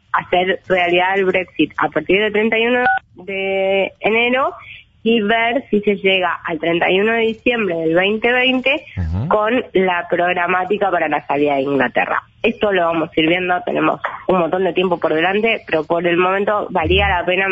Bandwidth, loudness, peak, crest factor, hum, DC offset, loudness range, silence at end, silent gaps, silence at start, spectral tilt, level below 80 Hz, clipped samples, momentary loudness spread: 7.6 kHz; -16 LUFS; -4 dBFS; 12 dB; none; under 0.1%; 1 LU; 0 s; none; 0.15 s; -7.5 dB/octave; -40 dBFS; under 0.1%; 5 LU